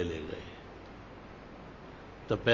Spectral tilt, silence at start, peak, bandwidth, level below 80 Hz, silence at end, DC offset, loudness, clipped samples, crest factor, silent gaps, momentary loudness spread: -6 dB/octave; 0 s; -10 dBFS; 7.6 kHz; -54 dBFS; 0 s; under 0.1%; -42 LUFS; under 0.1%; 26 dB; none; 13 LU